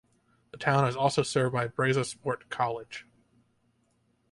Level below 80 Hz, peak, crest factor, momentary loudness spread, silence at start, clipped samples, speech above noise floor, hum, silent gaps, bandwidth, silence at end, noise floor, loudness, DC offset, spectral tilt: -66 dBFS; -10 dBFS; 22 dB; 10 LU; 0.55 s; under 0.1%; 43 dB; none; none; 11.5 kHz; 1.3 s; -71 dBFS; -28 LUFS; under 0.1%; -5 dB/octave